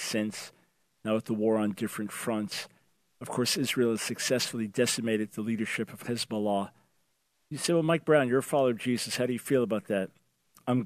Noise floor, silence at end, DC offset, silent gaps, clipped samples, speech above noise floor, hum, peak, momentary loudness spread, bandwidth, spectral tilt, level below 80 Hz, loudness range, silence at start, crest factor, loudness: -75 dBFS; 0 s; under 0.1%; none; under 0.1%; 46 dB; none; -10 dBFS; 11 LU; 14.5 kHz; -4.5 dB/octave; -76 dBFS; 4 LU; 0 s; 20 dB; -29 LUFS